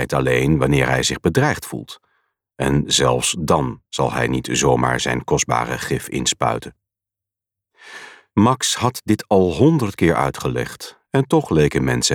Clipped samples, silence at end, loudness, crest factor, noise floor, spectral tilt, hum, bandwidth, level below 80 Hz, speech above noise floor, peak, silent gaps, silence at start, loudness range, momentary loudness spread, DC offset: under 0.1%; 0 s; -18 LUFS; 16 dB; -87 dBFS; -4.5 dB/octave; none; 18 kHz; -40 dBFS; 69 dB; -2 dBFS; none; 0 s; 4 LU; 10 LU; under 0.1%